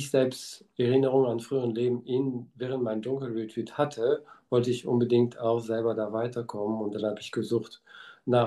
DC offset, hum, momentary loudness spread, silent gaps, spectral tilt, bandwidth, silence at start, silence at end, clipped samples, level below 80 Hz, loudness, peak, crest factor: under 0.1%; none; 9 LU; none; -7 dB/octave; 12.5 kHz; 0 s; 0 s; under 0.1%; -74 dBFS; -29 LUFS; -10 dBFS; 18 dB